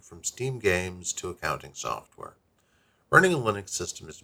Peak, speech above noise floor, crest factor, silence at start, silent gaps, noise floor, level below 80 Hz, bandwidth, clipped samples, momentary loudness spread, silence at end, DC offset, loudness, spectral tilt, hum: -2 dBFS; 39 dB; 26 dB; 0.1 s; none; -67 dBFS; -58 dBFS; 18 kHz; under 0.1%; 16 LU; 0.05 s; under 0.1%; -27 LUFS; -4 dB/octave; none